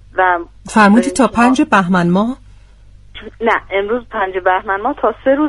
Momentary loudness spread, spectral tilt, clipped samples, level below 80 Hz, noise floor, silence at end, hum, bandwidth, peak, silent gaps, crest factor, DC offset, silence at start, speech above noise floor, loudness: 10 LU; -6 dB/octave; under 0.1%; -42 dBFS; -41 dBFS; 0 s; none; 11.5 kHz; 0 dBFS; none; 14 dB; under 0.1%; 0.15 s; 27 dB; -14 LUFS